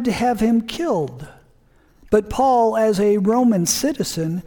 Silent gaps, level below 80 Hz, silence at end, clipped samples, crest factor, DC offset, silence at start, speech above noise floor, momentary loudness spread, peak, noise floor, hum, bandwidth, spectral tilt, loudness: none; -44 dBFS; 0.05 s; under 0.1%; 16 dB; under 0.1%; 0 s; 36 dB; 7 LU; -4 dBFS; -54 dBFS; none; 19 kHz; -5 dB/octave; -18 LUFS